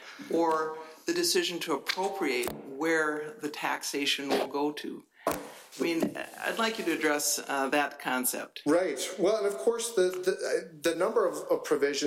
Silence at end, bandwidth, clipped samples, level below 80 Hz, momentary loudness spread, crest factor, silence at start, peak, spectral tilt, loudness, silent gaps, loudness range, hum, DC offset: 0 s; 16 kHz; under 0.1%; -70 dBFS; 7 LU; 16 dB; 0 s; -14 dBFS; -2.5 dB/octave; -30 LUFS; none; 3 LU; none; under 0.1%